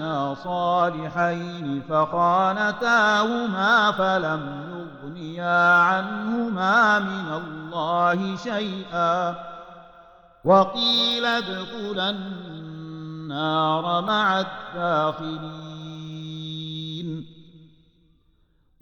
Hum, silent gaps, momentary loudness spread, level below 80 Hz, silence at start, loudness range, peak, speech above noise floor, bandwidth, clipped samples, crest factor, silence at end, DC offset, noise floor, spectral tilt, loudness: none; none; 18 LU; -62 dBFS; 0 s; 7 LU; -6 dBFS; 40 dB; 16.5 kHz; under 0.1%; 18 dB; 1.15 s; under 0.1%; -62 dBFS; -5 dB/octave; -22 LUFS